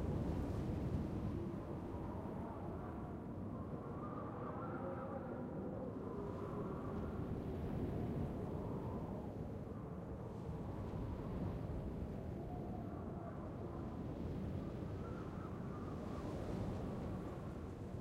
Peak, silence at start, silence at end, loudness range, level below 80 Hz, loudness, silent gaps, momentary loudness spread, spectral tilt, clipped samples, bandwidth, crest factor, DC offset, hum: -30 dBFS; 0 s; 0 s; 2 LU; -54 dBFS; -46 LUFS; none; 5 LU; -9 dB/octave; under 0.1%; 15.5 kHz; 16 dB; under 0.1%; none